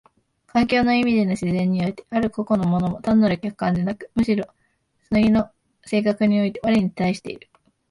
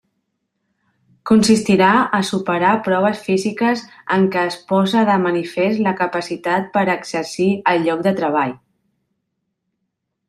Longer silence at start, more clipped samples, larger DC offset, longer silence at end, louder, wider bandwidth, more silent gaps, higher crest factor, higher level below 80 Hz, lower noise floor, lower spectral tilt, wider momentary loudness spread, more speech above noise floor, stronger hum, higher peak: second, 0.55 s vs 1.25 s; neither; neither; second, 0.55 s vs 1.75 s; second, -21 LUFS vs -17 LUFS; second, 11.5 kHz vs 13 kHz; neither; about the same, 14 dB vs 16 dB; first, -48 dBFS vs -58 dBFS; second, -67 dBFS vs -75 dBFS; first, -7.5 dB/octave vs -5.5 dB/octave; about the same, 7 LU vs 8 LU; second, 47 dB vs 58 dB; neither; second, -8 dBFS vs -2 dBFS